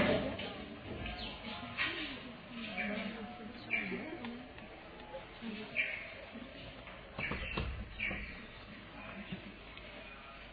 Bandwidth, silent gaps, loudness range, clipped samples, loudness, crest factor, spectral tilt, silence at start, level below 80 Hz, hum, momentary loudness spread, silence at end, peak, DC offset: 5 kHz; none; 3 LU; under 0.1%; -41 LUFS; 24 dB; -7.5 dB/octave; 0 s; -54 dBFS; none; 13 LU; 0 s; -18 dBFS; under 0.1%